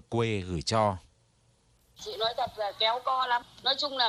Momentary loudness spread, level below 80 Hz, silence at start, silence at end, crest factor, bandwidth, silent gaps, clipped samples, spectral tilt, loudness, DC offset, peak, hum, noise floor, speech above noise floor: 7 LU; -56 dBFS; 0.1 s; 0 s; 18 dB; 15 kHz; none; under 0.1%; -4 dB/octave; -29 LUFS; under 0.1%; -12 dBFS; none; -66 dBFS; 37 dB